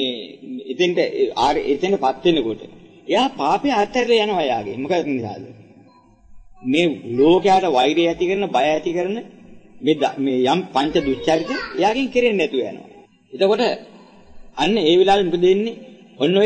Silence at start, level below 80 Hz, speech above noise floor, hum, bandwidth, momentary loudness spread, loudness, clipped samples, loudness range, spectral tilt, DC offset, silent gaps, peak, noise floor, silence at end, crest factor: 0 s; -50 dBFS; 32 dB; none; 9 kHz; 15 LU; -19 LUFS; under 0.1%; 3 LU; -5.5 dB/octave; under 0.1%; none; -2 dBFS; -50 dBFS; 0 s; 16 dB